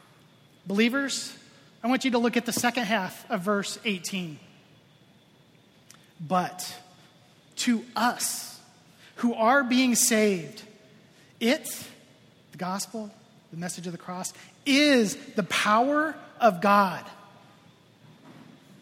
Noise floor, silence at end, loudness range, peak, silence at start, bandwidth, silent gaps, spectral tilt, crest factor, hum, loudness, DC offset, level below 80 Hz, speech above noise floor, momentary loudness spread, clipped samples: -58 dBFS; 0.5 s; 10 LU; -6 dBFS; 0.65 s; 16 kHz; none; -3.5 dB/octave; 22 dB; none; -26 LUFS; under 0.1%; -72 dBFS; 33 dB; 18 LU; under 0.1%